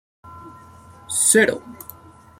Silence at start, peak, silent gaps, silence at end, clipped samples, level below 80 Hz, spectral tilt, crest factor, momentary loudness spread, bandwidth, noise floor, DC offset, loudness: 0.25 s; -2 dBFS; none; 0.65 s; under 0.1%; -62 dBFS; -2 dB/octave; 22 dB; 25 LU; 16.5 kHz; -45 dBFS; under 0.1%; -17 LUFS